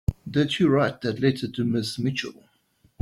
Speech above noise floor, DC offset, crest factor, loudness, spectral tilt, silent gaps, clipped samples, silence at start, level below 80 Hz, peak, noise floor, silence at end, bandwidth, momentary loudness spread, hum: 40 dB; under 0.1%; 18 dB; -24 LUFS; -6.5 dB/octave; none; under 0.1%; 0.1 s; -44 dBFS; -8 dBFS; -64 dBFS; 0.7 s; 14.5 kHz; 7 LU; none